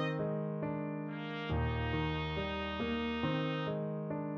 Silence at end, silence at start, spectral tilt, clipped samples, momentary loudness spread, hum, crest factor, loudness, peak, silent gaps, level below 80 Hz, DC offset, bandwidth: 0 s; 0 s; -5 dB/octave; under 0.1%; 4 LU; none; 14 dB; -37 LUFS; -22 dBFS; none; -48 dBFS; under 0.1%; 6.6 kHz